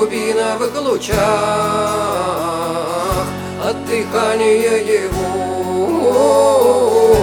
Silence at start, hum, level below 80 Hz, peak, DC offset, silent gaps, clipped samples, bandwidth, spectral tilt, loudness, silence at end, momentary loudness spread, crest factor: 0 s; none; -38 dBFS; 0 dBFS; under 0.1%; none; under 0.1%; 19.5 kHz; -4.5 dB/octave; -15 LUFS; 0 s; 8 LU; 14 dB